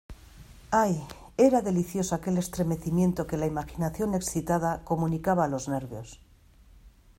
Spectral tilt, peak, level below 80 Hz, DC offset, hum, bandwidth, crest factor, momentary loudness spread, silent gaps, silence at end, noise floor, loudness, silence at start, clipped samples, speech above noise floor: -6.5 dB/octave; -8 dBFS; -50 dBFS; under 0.1%; none; 16 kHz; 20 dB; 10 LU; none; 0.3 s; -56 dBFS; -28 LUFS; 0.1 s; under 0.1%; 29 dB